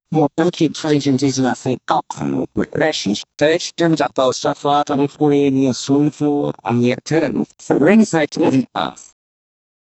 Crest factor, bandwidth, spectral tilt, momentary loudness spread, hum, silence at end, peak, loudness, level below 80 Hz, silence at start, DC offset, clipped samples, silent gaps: 16 dB; 8.4 kHz; -5.5 dB/octave; 7 LU; none; 0.95 s; 0 dBFS; -17 LUFS; -54 dBFS; 0.1 s; under 0.1%; under 0.1%; none